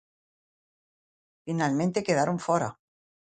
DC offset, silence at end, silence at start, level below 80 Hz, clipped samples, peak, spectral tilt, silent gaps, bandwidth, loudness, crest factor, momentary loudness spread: under 0.1%; 0.5 s; 1.45 s; -68 dBFS; under 0.1%; -10 dBFS; -6 dB/octave; none; 9.4 kHz; -27 LUFS; 20 dB; 9 LU